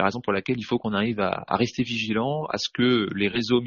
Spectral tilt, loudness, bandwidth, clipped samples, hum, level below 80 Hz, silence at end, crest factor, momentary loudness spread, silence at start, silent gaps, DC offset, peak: -4 dB/octave; -25 LUFS; 7.2 kHz; under 0.1%; none; -58 dBFS; 0 s; 18 dB; 5 LU; 0 s; none; under 0.1%; -6 dBFS